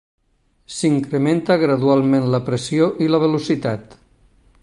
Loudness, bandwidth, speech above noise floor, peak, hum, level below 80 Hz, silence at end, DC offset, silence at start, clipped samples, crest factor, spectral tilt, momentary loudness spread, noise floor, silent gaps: -18 LUFS; 11.5 kHz; 45 dB; -4 dBFS; none; -56 dBFS; 0.8 s; under 0.1%; 0.7 s; under 0.1%; 16 dB; -6.5 dB/octave; 6 LU; -62 dBFS; none